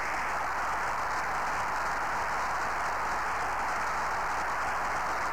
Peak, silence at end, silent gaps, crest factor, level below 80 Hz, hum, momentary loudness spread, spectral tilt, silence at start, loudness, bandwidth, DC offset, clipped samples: -22 dBFS; 0 s; none; 8 dB; -50 dBFS; none; 0 LU; -2.5 dB/octave; 0 s; -31 LUFS; over 20 kHz; 0.9%; under 0.1%